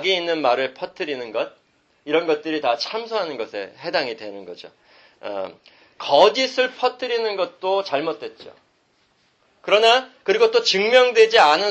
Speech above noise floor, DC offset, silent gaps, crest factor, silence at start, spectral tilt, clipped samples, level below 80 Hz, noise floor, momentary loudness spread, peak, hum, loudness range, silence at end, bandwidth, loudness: 43 dB; under 0.1%; none; 20 dB; 0 s; -2.5 dB/octave; under 0.1%; -72 dBFS; -63 dBFS; 18 LU; -2 dBFS; none; 8 LU; 0 s; 8.6 kHz; -19 LUFS